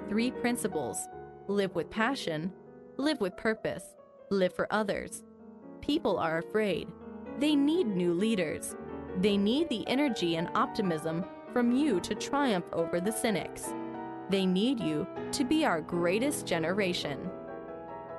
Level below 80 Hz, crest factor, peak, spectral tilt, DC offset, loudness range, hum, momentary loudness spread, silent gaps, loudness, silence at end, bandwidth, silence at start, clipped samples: -62 dBFS; 16 dB; -14 dBFS; -5 dB/octave; under 0.1%; 3 LU; none; 14 LU; none; -31 LUFS; 0 s; 12 kHz; 0 s; under 0.1%